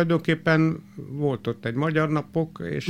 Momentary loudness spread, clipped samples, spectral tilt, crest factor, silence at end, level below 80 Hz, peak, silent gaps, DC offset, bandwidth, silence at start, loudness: 8 LU; under 0.1%; -7.5 dB/octave; 16 dB; 0 s; -58 dBFS; -8 dBFS; none; under 0.1%; 9.2 kHz; 0 s; -24 LUFS